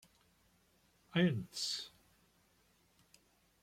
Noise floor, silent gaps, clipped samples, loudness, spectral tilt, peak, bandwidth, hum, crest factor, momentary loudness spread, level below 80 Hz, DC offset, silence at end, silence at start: -73 dBFS; none; under 0.1%; -37 LUFS; -5 dB/octave; -20 dBFS; 15.5 kHz; none; 22 dB; 9 LU; -76 dBFS; under 0.1%; 1.75 s; 1.15 s